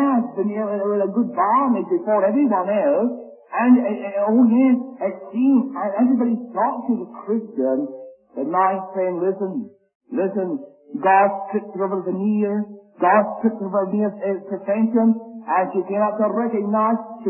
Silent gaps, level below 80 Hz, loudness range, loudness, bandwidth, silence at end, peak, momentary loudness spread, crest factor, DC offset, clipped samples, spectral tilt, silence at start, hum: 9.95-10.00 s; -74 dBFS; 5 LU; -20 LUFS; 3.1 kHz; 0 s; -4 dBFS; 10 LU; 16 dB; under 0.1%; under 0.1%; -12.5 dB/octave; 0 s; none